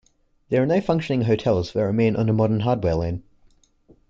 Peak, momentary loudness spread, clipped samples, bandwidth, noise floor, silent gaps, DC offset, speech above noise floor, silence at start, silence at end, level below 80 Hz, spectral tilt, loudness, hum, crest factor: -6 dBFS; 5 LU; under 0.1%; 7.6 kHz; -57 dBFS; none; under 0.1%; 37 dB; 0.5 s; 0.9 s; -46 dBFS; -8.5 dB/octave; -22 LUFS; none; 16 dB